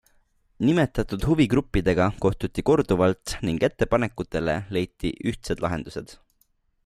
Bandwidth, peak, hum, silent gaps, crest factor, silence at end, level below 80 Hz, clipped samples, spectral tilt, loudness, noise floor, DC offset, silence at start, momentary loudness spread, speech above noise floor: 15 kHz; -8 dBFS; none; none; 16 dB; 0.7 s; -40 dBFS; under 0.1%; -6.5 dB/octave; -24 LUFS; -67 dBFS; under 0.1%; 0.6 s; 8 LU; 43 dB